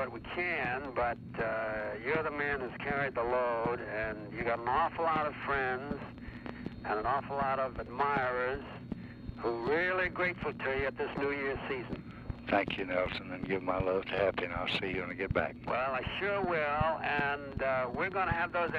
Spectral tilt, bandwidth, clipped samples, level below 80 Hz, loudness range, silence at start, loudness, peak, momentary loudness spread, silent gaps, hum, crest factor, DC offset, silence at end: -7.5 dB/octave; 8.4 kHz; under 0.1%; -52 dBFS; 2 LU; 0 s; -34 LUFS; -16 dBFS; 8 LU; none; none; 18 dB; under 0.1%; 0 s